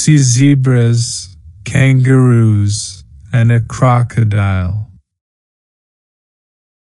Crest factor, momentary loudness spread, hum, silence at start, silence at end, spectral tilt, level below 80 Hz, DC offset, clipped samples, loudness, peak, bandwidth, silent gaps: 12 dB; 14 LU; none; 0 s; 2.1 s; -6 dB/octave; -42 dBFS; under 0.1%; under 0.1%; -12 LUFS; 0 dBFS; 11.5 kHz; none